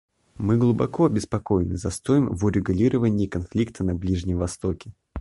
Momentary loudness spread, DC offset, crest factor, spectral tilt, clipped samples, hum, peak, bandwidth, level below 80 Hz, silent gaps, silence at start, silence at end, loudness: 8 LU; under 0.1%; 16 dB; -7.5 dB/octave; under 0.1%; none; -8 dBFS; 11.5 kHz; -38 dBFS; none; 0.4 s; 0 s; -24 LUFS